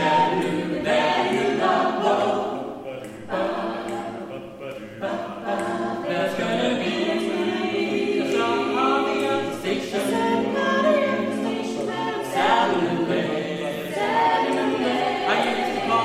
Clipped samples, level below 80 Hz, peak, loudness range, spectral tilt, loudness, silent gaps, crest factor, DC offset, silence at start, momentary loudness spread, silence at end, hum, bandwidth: under 0.1%; -60 dBFS; -6 dBFS; 6 LU; -5 dB/octave; -23 LUFS; none; 16 dB; under 0.1%; 0 s; 10 LU; 0 s; none; 15.5 kHz